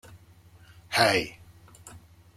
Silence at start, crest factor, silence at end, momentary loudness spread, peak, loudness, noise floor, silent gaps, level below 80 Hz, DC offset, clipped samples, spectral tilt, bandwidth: 0.1 s; 24 dB; 0.4 s; 26 LU; -6 dBFS; -24 LUFS; -54 dBFS; none; -60 dBFS; under 0.1%; under 0.1%; -3 dB/octave; 16.5 kHz